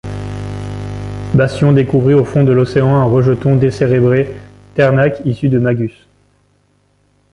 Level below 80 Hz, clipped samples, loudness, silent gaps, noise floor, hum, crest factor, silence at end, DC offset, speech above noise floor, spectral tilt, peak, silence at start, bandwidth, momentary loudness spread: -38 dBFS; under 0.1%; -13 LUFS; none; -56 dBFS; 50 Hz at -30 dBFS; 12 dB; 1.45 s; under 0.1%; 45 dB; -9 dB/octave; 0 dBFS; 0.05 s; 10.5 kHz; 13 LU